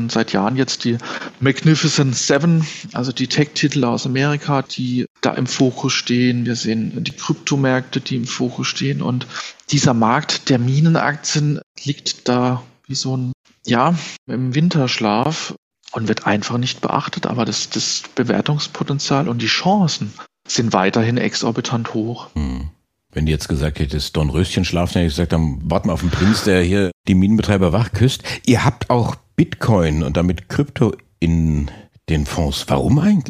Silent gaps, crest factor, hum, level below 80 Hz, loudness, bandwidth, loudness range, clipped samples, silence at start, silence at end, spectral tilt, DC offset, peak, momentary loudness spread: 5.10-5.15 s, 11.63-11.75 s, 13.34-13.44 s, 14.18-14.26 s, 15.58-15.71 s, 26.93-27.04 s; 18 dB; none; -34 dBFS; -18 LUFS; 14.5 kHz; 4 LU; under 0.1%; 0 s; 0 s; -5 dB/octave; under 0.1%; 0 dBFS; 9 LU